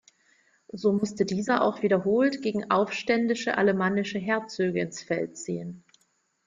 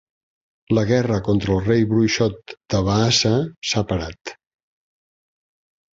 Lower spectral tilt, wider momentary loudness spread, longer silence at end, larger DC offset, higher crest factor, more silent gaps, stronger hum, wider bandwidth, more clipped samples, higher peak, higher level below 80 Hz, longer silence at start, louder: about the same, -5.5 dB/octave vs -5 dB/octave; about the same, 9 LU vs 10 LU; second, 0.7 s vs 1.6 s; neither; about the same, 18 dB vs 18 dB; second, none vs 3.57-3.62 s, 4.21-4.25 s; neither; first, 9.4 kHz vs 7.8 kHz; neither; second, -10 dBFS vs -4 dBFS; second, -66 dBFS vs -42 dBFS; about the same, 0.75 s vs 0.7 s; second, -26 LUFS vs -20 LUFS